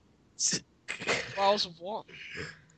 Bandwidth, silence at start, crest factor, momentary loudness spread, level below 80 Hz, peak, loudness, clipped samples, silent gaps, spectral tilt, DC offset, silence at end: 9.2 kHz; 0.4 s; 20 dB; 14 LU; -66 dBFS; -14 dBFS; -31 LUFS; under 0.1%; none; -1.5 dB/octave; under 0.1%; 0.2 s